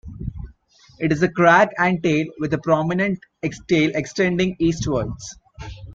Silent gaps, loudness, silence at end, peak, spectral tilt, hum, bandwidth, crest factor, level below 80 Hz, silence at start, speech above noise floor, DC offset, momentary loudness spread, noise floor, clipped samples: none; -20 LUFS; 0 s; -2 dBFS; -6 dB/octave; none; 7.8 kHz; 20 dB; -42 dBFS; 0.05 s; 32 dB; under 0.1%; 21 LU; -51 dBFS; under 0.1%